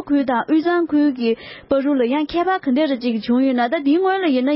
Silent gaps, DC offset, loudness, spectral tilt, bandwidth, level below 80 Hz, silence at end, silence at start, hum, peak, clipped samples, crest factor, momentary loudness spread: none; under 0.1%; -18 LUFS; -10 dB/octave; 5.8 kHz; -54 dBFS; 0 s; 0 s; none; -6 dBFS; under 0.1%; 12 dB; 5 LU